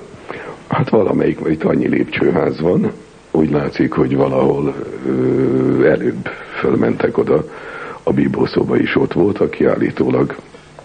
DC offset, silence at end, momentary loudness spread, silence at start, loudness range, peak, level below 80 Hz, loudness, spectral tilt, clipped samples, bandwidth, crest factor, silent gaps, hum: under 0.1%; 0.25 s; 11 LU; 0 s; 1 LU; -2 dBFS; -44 dBFS; -16 LUFS; -8.5 dB/octave; under 0.1%; 9.4 kHz; 14 dB; none; none